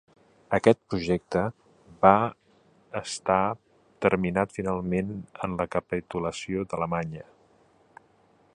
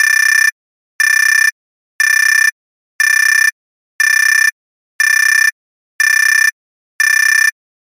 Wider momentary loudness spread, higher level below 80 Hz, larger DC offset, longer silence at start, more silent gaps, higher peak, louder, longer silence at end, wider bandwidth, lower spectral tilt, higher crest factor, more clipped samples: first, 12 LU vs 6 LU; first, -54 dBFS vs under -90 dBFS; neither; first, 0.5 s vs 0 s; second, none vs 0.52-0.99 s, 1.52-1.99 s, 2.52-2.99 s, 3.52-3.99 s, 4.52-4.99 s, 5.52-5.99 s, 6.52-6.99 s; about the same, -2 dBFS vs 0 dBFS; second, -27 LUFS vs -10 LUFS; first, 1.35 s vs 0.5 s; second, 11 kHz vs 17 kHz; first, -6 dB/octave vs 13 dB/octave; first, 26 dB vs 12 dB; neither